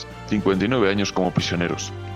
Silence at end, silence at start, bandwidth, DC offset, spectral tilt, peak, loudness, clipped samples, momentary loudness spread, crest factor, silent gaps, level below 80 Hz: 0 s; 0 s; 12.5 kHz; under 0.1%; -5 dB/octave; -6 dBFS; -22 LUFS; under 0.1%; 6 LU; 16 dB; none; -46 dBFS